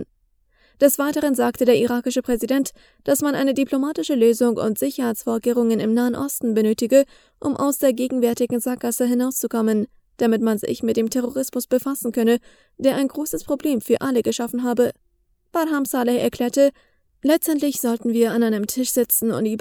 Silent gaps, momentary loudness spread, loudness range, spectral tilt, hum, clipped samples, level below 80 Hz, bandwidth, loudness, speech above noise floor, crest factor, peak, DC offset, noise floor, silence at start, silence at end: none; 6 LU; 2 LU; -4.5 dB/octave; none; under 0.1%; -56 dBFS; over 20 kHz; -21 LUFS; 44 dB; 18 dB; -2 dBFS; under 0.1%; -64 dBFS; 0 s; 0 s